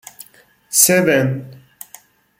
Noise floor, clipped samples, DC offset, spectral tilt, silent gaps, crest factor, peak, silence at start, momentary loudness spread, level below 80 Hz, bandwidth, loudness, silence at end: -50 dBFS; under 0.1%; under 0.1%; -3.5 dB/octave; none; 20 dB; 0 dBFS; 0.2 s; 12 LU; -62 dBFS; 17 kHz; -14 LUFS; 0.85 s